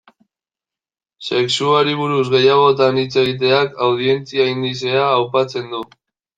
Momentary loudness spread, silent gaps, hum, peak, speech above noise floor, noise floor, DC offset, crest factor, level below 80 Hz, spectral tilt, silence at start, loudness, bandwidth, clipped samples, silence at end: 10 LU; none; none; -2 dBFS; over 74 dB; under -90 dBFS; under 0.1%; 16 dB; -62 dBFS; -5 dB/octave; 1.2 s; -16 LUFS; 9.2 kHz; under 0.1%; 0.5 s